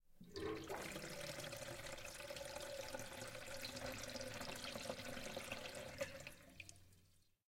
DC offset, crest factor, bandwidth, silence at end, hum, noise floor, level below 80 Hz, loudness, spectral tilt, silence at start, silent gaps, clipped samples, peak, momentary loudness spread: under 0.1%; 20 dB; 16.5 kHz; 0.25 s; none; -73 dBFS; -66 dBFS; -50 LUFS; -3 dB/octave; 0.05 s; none; under 0.1%; -32 dBFS; 8 LU